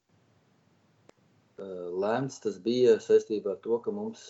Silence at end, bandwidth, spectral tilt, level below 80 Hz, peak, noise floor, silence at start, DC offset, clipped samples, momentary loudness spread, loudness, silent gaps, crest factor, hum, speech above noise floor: 0 s; 8 kHz; -6 dB/octave; -82 dBFS; -12 dBFS; -67 dBFS; 1.6 s; under 0.1%; under 0.1%; 14 LU; -28 LUFS; none; 18 dB; none; 39 dB